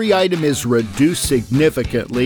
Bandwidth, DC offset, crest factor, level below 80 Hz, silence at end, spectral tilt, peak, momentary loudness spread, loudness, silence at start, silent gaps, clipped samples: 19 kHz; under 0.1%; 14 dB; -36 dBFS; 0 s; -5 dB/octave; -2 dBFS; 4 LU; -17 LUFS; 0 s; none; under 0.1%